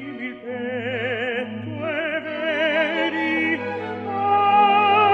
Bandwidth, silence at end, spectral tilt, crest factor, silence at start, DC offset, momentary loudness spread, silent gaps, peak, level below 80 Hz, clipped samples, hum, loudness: 6.8 kHz; 0 s; -6 dB/octave; 16 dB; 0 s; under 0.1%; 13 LU; none; -6 dBFS; -68 dBFS; under 0.1%; none; -21 LUFS